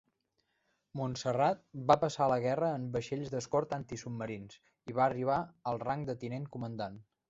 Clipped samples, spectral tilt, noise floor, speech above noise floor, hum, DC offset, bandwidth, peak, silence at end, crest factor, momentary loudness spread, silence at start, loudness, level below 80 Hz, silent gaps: under 0.1%; -6 dB/octave; -80 dBFS; 46 dB; none; under 0.1%; 8 kHz; -10 dBFS; 0.25 s; 24 dB; 12 LU; 0.95 s; -34 LUFS; -66 dBFS; none